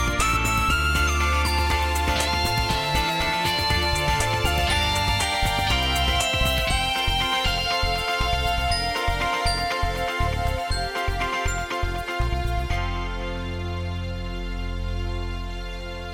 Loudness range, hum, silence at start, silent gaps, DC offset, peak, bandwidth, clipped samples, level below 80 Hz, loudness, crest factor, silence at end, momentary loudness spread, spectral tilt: 7 LU; none; 0 s; none; under 0.1%; -10 dBFS; 17 kHz; under 0.1%; -30 dBFS; -23 LUFS; 14 dB; 0 s; 9 LU; -3.5 dB/octave